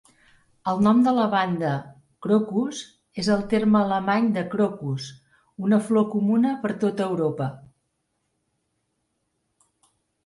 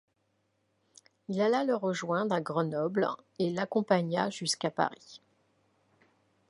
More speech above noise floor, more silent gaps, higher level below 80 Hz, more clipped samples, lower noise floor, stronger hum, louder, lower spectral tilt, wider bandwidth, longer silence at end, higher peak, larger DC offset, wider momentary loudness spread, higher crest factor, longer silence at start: first, 53 dB vs 46 dB; neither; first, -62 dBFS vs -80 dBFS; neither; about the same, -75 dBFS vs -76 dBFS; neither; first, -23 LUFS vs -31 LUFS; first, -7 dB/octave vs -5 dB/octave; about the same, 11.5 kHz vs 11.5 kHz; first, 2.65 s vs 1.35 s; first, -8 dBFS vs -12 dBFS; neither; first, 12 LU vs 6 LU; second, 16 dB vs 22 dB; second, 0.65 s vs 1.3 s